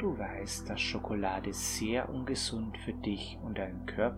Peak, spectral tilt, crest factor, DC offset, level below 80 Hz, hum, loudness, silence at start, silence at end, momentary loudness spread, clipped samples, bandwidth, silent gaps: -16 dBFS; -4 dB/octave; 20 dB; under 0.1%; -48 dBFS; none; -35 LUFS; 0 s; 0 s; 5 LU; under 0.1%; 16.5 kHz; none